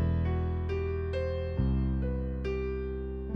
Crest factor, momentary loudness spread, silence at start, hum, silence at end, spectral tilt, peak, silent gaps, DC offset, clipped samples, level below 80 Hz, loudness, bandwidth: 14 dB; 5 LU; 0 s; none; 0 s; -9.5 dB/octave; -18 dBFS; none; under 0.1%; under 0.1%; -34 dBFS; -32 LUFS; 5.6 kHz